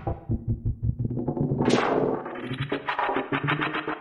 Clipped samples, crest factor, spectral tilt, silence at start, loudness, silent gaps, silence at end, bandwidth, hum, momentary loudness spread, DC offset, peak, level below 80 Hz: under 0.1%; 18 dB; -6.5 dB/octave; 0 s; -27 LUFS; none; 0 s; 11.5 kHz; none; 8 LU; under 0.1%; -8 dBFS; -40 dBFS